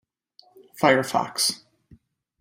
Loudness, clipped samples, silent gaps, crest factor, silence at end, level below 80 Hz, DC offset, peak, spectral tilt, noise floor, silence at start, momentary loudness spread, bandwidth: -22 LUFS; under 0.1%; none; 22 dB; 0.85 s; -68 dBFS; under 0.1%; -4 dBFS; -3 dB/octave; -58 dBFS; 0.75 s; 6 LU; 16 kHz